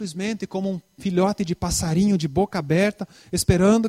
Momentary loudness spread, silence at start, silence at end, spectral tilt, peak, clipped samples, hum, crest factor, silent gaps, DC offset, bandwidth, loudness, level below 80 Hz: 8 LU; 0 s; 0 s; -5.5 dB/octave; -4 dBFS; under 0.1%; none; 18 dB; none; under 0.1%; 16 kHz; -23 LUFS; -40 dBFS